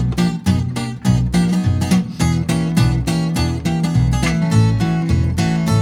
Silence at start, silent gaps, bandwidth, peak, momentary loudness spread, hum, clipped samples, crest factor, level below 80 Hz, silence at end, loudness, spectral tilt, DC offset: 0 s; none; 16 kHz; -2 dBFS; 3 LU; none; under 0.1%; 14 dB; -28 dBFS; 0 s; -17 LUFS; -6.5 dB/octave; under 0.1%